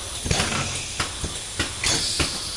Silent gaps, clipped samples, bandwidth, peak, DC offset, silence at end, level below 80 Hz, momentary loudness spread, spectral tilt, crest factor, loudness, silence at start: none; under 0.1%; 11.5 kHz; -4 dBFS; under 0.1%; 0 s; -38 dBFS; 6 LU; -2 dB/octave; 22 dB; -24 LUFS; 0 s